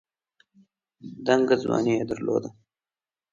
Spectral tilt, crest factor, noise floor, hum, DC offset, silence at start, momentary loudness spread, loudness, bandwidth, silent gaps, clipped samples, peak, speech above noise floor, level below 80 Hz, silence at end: -6 dB/octave; 22 dB; under -90 dBFS; none; under 0.1%; 1.05 s; 21 LU; -25 LUFS; 7.6 kHz; none; under 0.1%; -6 dBFS; over 66 dB; -62 dBFS; 0.8 s